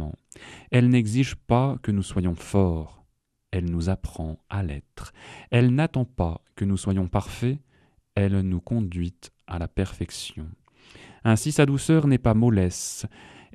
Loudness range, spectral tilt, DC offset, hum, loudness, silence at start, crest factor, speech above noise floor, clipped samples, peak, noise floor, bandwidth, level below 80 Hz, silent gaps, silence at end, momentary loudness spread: 6 LU; -6.5 dB/octave; under 0.1%; none; -25 LUFS; 0 s; 20 dB; 44 dB; under 0.1%; -4 dBFS; -68 dBFS; 13.5 kHz; -42 dBFS; none; 0.3 s; 17 LU